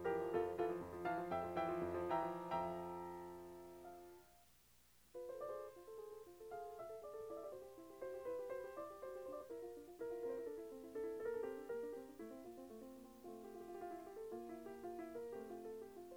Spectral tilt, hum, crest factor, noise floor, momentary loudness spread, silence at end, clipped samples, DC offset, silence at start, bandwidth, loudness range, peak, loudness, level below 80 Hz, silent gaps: -6.5 dB/octave; 60 Hz at -80 dBFS; 20 dB; -72 dBFS; 14 LU; 0 s; under 0.1%; under 0.1%; 0 s; over 20 kHz; 9 LU; -28 dBFS; -48 LUFS; -76 dBFS; none